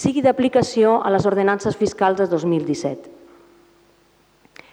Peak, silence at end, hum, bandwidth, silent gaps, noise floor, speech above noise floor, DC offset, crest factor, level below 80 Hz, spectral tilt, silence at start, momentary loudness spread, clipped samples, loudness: -2 dBFS; 1.6 s; none; 10.5 kHz; none; -57 dBFS; 39 dB; under 0.1%; 18 dB; -54 dBFS; -6 dB/octave; 0 s; 8 LU; under 0.1%; -19 LUFS